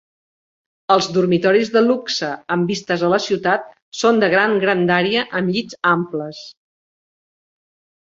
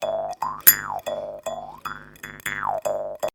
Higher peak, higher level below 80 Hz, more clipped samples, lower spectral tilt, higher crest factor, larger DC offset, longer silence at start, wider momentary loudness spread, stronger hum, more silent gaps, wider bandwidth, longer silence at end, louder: about the same, -2 dBFS vs 0 dBFS; second, -62 dBFS vs -56 dBFS; neither; first, -5 dB/octave vs -1 dB/octave; second, 18 dB vs 26 dB; neither; first, 0.9 s vs 0 s; second, 8 LU vs 20 LU; second, none vs 50 Hz at -60 dBFS; first, 3.82-3.92 s vs none; second, 7.8 kHz vs over 20 kHz; first, 1.6 s vs 0.05 s; first, -17 LUFS vs -22 LUFS